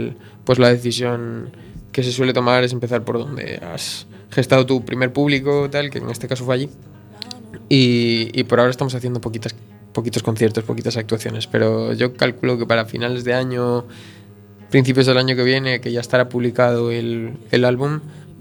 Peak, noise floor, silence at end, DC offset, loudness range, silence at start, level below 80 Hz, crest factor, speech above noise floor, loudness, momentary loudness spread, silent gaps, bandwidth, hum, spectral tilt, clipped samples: 0 dBFS; -42 dBFS; 0 s; under 0.1%; 3 LU; 0 s; -54 dBFS; 18 dB; 24 dB; -19 LUFS; 13 LU; none; 19 kHz; none; -6 dB/octave; under 0.1%